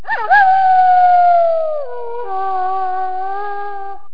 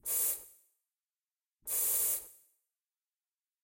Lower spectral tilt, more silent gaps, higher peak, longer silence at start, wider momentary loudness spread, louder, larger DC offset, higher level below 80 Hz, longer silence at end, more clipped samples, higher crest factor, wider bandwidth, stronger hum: first, -5.5 dB/octave vs 1.5 dB/octave; second, none vs 1.52-1.56 s; first, 0 dBFS vs -18 dBFS; about the same, 0.05 s vs 0.05 s; about the same, 16 LU vs 17 LU; first, -14 LUFS vs -31 LUFS; first, 7% vs under 0.1%; first, -58 dBFS vs -74 dBFS; second, 0.15 s vs 1.3 s; neither; second, 14 dB vs 20 dB; second, 5.2 kHz vs 16.5 kHz; neither